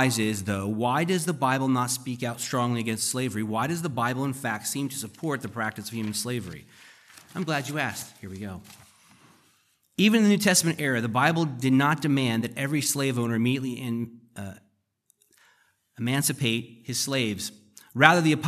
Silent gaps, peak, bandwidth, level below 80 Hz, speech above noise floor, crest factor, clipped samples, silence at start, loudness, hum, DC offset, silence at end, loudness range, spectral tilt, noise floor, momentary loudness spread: none; 0 dBFS; 15.5 kHz; -70 dBFS; 44 dB; 26 dB; under 0.1%; 0 s; -26 LUFS; none; under 0.1%; 0 s; 9 LU; -4 dB/octave; -70 dBFS; 17 LU